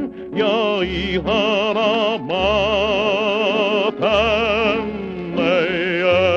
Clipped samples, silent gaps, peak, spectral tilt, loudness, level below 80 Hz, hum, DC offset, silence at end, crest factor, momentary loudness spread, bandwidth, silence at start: under 0.1%; none; -4 dBFS; -5.5 dB/octave; -18 LUFS; -40 dBFS; none; under 0.1%; 0 s; 14 dB; 4 LU; 7.4 kHz; 0 s